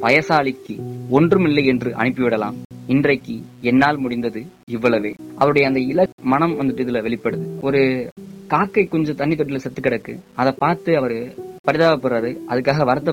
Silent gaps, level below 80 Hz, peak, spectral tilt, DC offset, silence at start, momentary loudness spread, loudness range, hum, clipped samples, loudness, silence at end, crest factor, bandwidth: 2.65-2.70 s, 4.63-4.67 s, 6.12-6.18 s, 8.12-8.16 s, 11.59-11.64 s; -52 dBFS; -4 dBFS; -7.5 dB/octave; under 0.1%; 0 s; 12 LU; 2 LU; none; under 0.1%; -19 LUFS; 0 s; 16 dB; 16 kHz